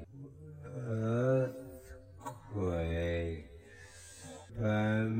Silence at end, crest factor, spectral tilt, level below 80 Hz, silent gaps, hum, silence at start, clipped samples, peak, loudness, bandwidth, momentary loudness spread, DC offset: 0 s; 16 dB; -7.5 dB/octave; -52 dBFS; none; none; 0 s; under 0.1%; -20 dBFS; -35 LUFS; 16 kHz; 21 LU; under 0.1%